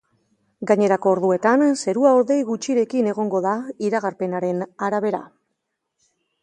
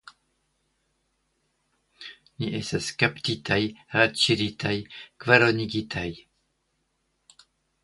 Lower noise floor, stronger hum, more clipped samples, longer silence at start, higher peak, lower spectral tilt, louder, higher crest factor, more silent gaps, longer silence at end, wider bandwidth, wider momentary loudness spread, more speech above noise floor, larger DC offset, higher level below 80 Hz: about the same, -77 dBFS vs -74 dBFS; neither; neither; second, 0.6 s vs 2 s; about the same, -4 dBFS vs -2 dBFS; first, -6 dB/octave vs -4.5 dB/octave; first, -20 LUFS vs -24 LUFS; second, 18 dB vs 26 dB; neither; second, 1.2 s vs 1.65 s; about the same, 11 kHz vs 11.5 kHz; second, 8 LU vs 21 LU; first, 57 dB vs 49 dB; neither; second, -72 dBFS vs -56 dBFS